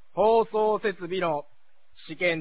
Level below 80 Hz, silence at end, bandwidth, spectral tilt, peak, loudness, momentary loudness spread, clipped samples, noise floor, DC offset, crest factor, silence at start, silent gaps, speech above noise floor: -62 dBFS; 0 s; 4 kHz; -9 dB/octave; -10 dBFS; -26 LUFS; 9 LU; under 0.1%; -60 dBFS; 0.6%; 16 dB; 0.15 s; none; 36 dB